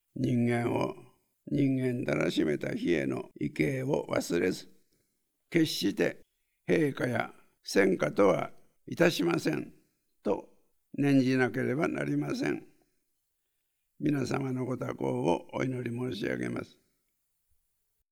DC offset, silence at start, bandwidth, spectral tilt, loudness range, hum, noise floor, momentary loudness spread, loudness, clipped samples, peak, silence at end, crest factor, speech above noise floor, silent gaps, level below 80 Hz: under 0.1%; 0.15 s; 17 kHz; -6 dB/octave; 5 LU; none; -79 dBFS; 11 LU; -30 LUFS; under 0.1%; -10 dBFS; 1.45 s; 20 dB; 49 dB; none; -68 dBFS